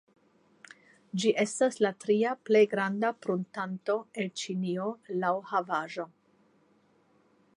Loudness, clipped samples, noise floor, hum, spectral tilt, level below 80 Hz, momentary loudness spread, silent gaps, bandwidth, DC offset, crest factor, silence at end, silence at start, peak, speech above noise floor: -30 LUFS; under 0.1%; -66 dBFS; none; -5 dB/octave; -84 dBFS; 10 LU; none; 11 kHz; under 0.1%; 20 dB; 1.5 s; 1.15 s; -12 dBFS; 37 dB